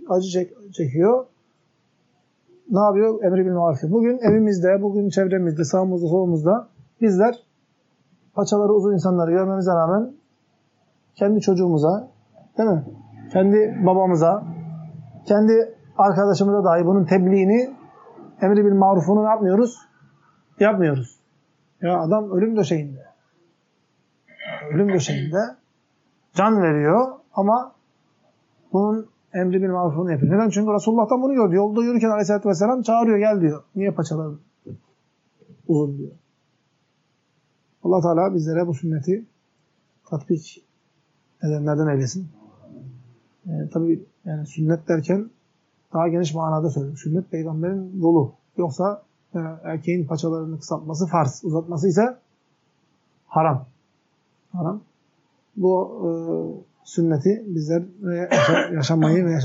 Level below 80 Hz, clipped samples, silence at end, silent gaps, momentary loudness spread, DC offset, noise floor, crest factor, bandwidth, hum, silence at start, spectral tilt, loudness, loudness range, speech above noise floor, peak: -72 dBFS; under 0.1%; 0 s; none; 13 LU; under 0.1%; -67 dBFS; 18 dB; 7.8 kHz; none; 0 s; -7.5 dB/octave; -20 LUFS; 8 LU; 48 dB; -4 dBFS